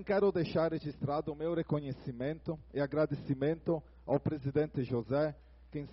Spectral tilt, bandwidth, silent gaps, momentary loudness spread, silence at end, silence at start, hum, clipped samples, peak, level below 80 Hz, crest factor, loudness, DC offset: -7.5 dB/octave; 5.8 kHz; none; 8 LU; 0 s; 0 s; none; under 0.1%; -18 dBFS; -58 dBFS; 16 dB; -35 LUFS; under 0.1%